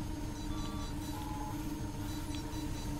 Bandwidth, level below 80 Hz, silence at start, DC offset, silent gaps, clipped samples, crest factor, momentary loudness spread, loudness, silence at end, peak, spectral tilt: 16 kHz; -44 dBFS; 0 s; under 0.1%; none; under 0.1%; 14 dB; 1 LU; -41 LUFS; 0 s; -24 dBFS; -5.5 dB/octave